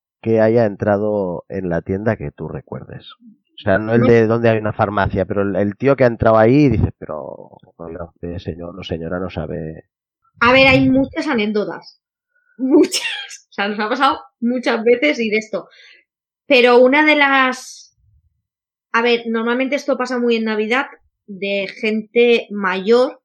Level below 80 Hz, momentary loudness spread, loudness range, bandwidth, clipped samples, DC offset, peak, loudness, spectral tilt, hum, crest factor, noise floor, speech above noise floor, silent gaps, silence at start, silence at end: -44 dBFS; 18 LU; 5 LU; 12.5 kHz; under 0.1%; under 0.1%; -2 dBFS; -16 LUFS; -6 dB/octave; none; 16 dB; -85 dBFS; 69 dB; none; 0.25 s; 0.1 s